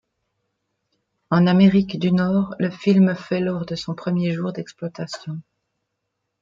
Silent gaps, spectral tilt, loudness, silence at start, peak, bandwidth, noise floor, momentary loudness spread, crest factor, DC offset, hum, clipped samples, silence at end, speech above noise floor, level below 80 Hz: none; -8 dB/octave; -20 LUFS; 1.3 s; -4 dBFS; 7.4 kHz; -78 dBFS; 16 LU; 18 dB; under 0.1%; none; under 0.1%; 1 s; 58 dB; -56 dBFS